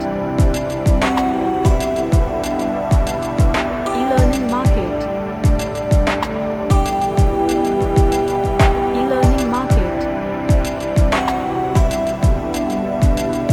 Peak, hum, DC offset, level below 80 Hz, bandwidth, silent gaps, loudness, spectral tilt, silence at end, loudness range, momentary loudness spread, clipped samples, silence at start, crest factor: -2 dBFS; none; under 0.1%; -22 dBFS; 17 kHz; none; -18 LUFS; -6.5 dB/octave; 0 s; 2 LU; 5 LU; under 0.1%; 0 s; 14 dB